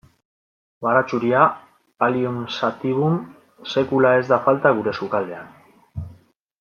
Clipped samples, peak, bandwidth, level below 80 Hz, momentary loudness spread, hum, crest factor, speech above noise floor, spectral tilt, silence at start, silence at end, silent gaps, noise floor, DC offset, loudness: under 0.1%; -2 dBFS; 7 kHz; -58 dBFS; 20 LU; none; 18 dB; 32 dB; -7 dB/octave; 0.8 s; 0.45 s; none; -51 dBFS; under 0.1%; -20 LUFS